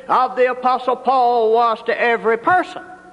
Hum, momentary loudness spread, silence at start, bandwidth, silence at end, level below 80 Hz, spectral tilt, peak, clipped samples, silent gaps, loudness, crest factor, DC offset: none; 4 LU; 0.05 s; 10.5 kHz; 0.15 s; -62 dBFS; -5 dB/octave; -4 dBFS; under 0.1%; none; -17 LUFS; 12 dB; under 0.1%